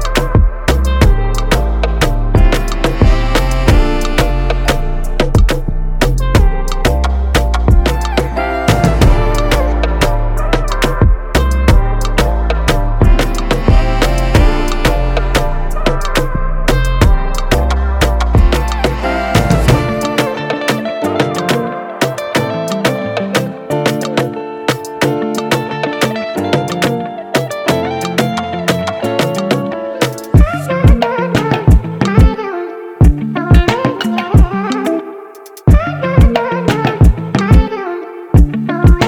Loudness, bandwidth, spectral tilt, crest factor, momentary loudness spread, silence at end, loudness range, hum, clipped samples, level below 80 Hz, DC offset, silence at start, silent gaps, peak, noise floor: -14 LUFS; 17 kHz; -6 dB/octave; 12 dB; 6 LU; 0 s; 3 LU; none; under 0.1%; -14 dBFS; under 0.1%; 0 s; none; 0 dBFS; -33 dBFS